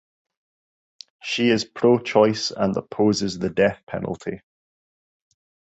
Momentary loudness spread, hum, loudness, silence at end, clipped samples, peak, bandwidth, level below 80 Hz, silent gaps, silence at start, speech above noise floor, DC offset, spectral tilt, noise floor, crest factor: 13 LU; none; -22 LUFS; 1.4 s; under 0.1%; -4 dBFS; 8.2 kHz; -56 dBFS; 3.83-3.87 s; 1.25 s; over 69 dB; under 0.1%; -5 dB/octave; under -90 dBFS; 20 dB